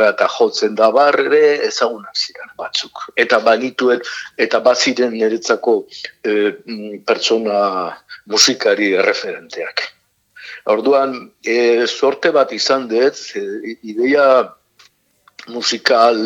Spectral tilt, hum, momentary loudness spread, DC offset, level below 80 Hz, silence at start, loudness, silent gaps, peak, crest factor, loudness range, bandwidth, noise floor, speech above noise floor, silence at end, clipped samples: -2 dB/octave; none; 14 LU; under 0.1%; -70 dBFS; 0 s; -15 LUFS; none; 0 dBFS; 16 dB; 2 LU; 17 kHz; -56 dBFS; 40 dB; 0 s; under 0.1%